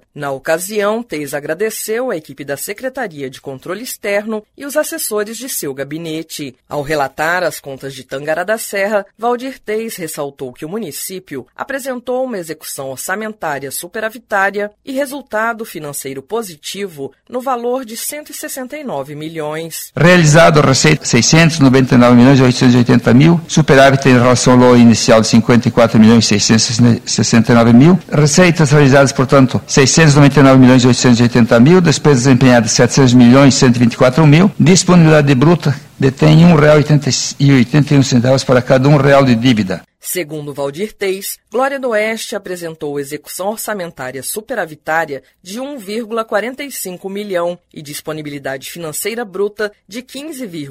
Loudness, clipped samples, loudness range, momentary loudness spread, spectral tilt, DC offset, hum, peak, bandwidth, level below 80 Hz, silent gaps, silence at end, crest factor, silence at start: -11 LUFS; under 0.1%; 13 LU; 17 LU; -5.5 dB/octave; under 0.1%; none; 0 dBFS; 16 kHz; -42 dBFS; none; 0 s; 12 dB; 0.15 s